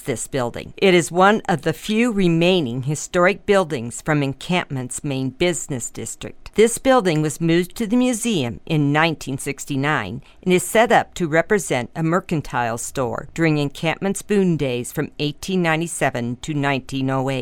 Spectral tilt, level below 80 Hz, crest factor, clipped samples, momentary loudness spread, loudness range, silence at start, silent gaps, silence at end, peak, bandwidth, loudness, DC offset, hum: -5 dB/octave; -46 dBFS; 16 dB; under 0.1%; 10 LU; 3 LU; 0 s; none; 0 s; -2 dBFS; 17.5 kHz; -20 LUFS; under 0.1%; none